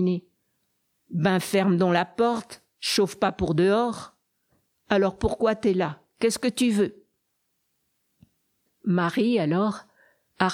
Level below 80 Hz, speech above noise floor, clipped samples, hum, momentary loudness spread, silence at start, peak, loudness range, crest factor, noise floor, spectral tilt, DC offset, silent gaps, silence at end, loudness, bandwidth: -50 dBFS; 52 dB; under 0.1%; none; 9 LU; 0 s; -6 dBFS; 5 LU; 20 dB; -75 dBFS; -5.5 dB/octave; under 0.1%; none; 0 s; -24 LUFS; 16 kHz